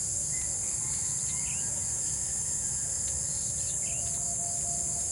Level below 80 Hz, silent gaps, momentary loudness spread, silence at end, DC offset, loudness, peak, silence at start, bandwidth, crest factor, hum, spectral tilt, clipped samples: -52 dBFS; none; 0 LU; 0 s; under 0.1%; -28 LUFS; -18 dBFS; 0 s; 16.5 kHz; 14 dB; none; -1.5 dB/octave; under 0.1%